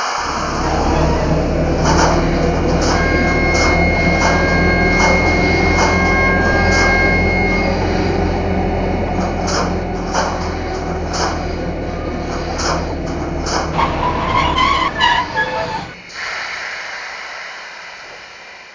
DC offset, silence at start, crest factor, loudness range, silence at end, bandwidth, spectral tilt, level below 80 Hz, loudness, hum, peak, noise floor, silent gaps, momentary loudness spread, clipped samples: under 0.1%; 0 s; 16 dB; 7 LU; 0 s; 7.6 kHz; -5 dB/octave; -24 dBFS; -16 LUFS; none; 0 dBFS; -36 dBFS; none; 12 LU; under 0.1%